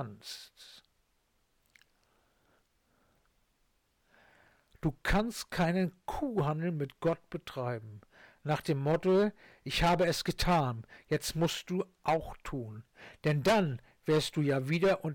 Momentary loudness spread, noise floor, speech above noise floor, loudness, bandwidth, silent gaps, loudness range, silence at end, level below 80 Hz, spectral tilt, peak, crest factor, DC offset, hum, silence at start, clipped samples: 14 LU; -75 dBFS; 43 dB; -32 LUFS; 18 kHz; none; 7 LU; 0 s; -50 dBFS; -5.5 dB/octave; -20 dBFS; 12 dB; under 0.1%; none; 0 s; under 0.1%